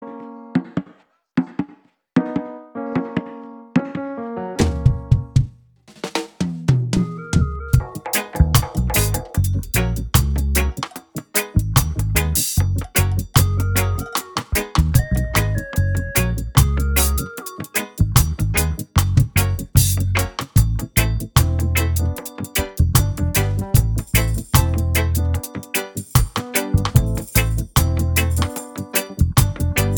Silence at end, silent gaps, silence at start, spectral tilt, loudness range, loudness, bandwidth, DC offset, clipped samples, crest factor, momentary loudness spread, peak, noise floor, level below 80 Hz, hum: 0 s; none; 0 s; -5 dB/octave; 4 LU; -20 LUFS; over 20 kHz; under 0.1%; under 0.1%; 18 dB; 9 LU; 0 dBFS; -52 dBFS; -26 dBFS; none